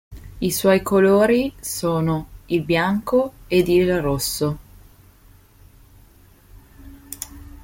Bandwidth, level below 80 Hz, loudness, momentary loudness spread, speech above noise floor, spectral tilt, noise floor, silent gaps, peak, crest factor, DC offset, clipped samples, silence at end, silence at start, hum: 17 kHz; -44 dBFS; -20 LUFS; 17 LU; 32 dB; -5.5 dB/octave; -50 dBFS; none; -4 dBFS; 18 dB; under 0.1%; under 0.1%; 0.1 s; 0.1 s; none